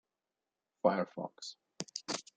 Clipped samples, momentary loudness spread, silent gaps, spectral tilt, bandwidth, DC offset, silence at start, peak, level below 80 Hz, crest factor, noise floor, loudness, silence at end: under 0.1%; 15 LU; none; -4 dB/octave; 9.4 kHz; under 0.1%; 0.85 s; -14 dBFS; -84 dBFS; 26 dB; under -90 dBFS; -37 LUFS; 0.15 s